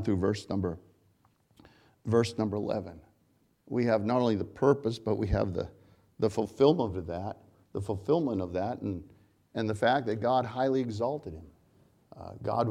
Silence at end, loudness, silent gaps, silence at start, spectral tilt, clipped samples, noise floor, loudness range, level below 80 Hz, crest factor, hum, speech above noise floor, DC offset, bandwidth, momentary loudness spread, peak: 0 s; -30 LUFS; none; 0 s; -7 dB/octave; under 0.1%; -69 dBFS; 4 LU; -52 dBFS; 22 dB; none; 40 dB; under 0.1%; 12 kHz; 15 LU; -8 dBFS